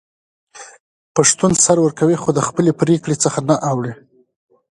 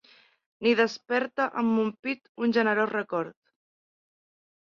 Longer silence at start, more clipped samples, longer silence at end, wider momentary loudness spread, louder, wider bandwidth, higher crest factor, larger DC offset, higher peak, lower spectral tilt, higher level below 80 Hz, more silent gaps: about the same, 0.55 s vs 0.6 s; neither; second, 0.75 s vs 1.4 s; about the same, 9 LU vs 9 LU; first, -15 LUFS vs -27 LUFS; first, 11.5 kHz vs 7 kHz; about the same, 18 dB vs 20 dB; neither; first, 0 dBFS vs -10 dBFS; about the same, -4.5 dB/octave vs -5.5 dB/octave; first, -52 dBFS vs -76 dBFS; first, 0.80-1.15 s vs 1.99-2.03 s, 2.29-2.35 s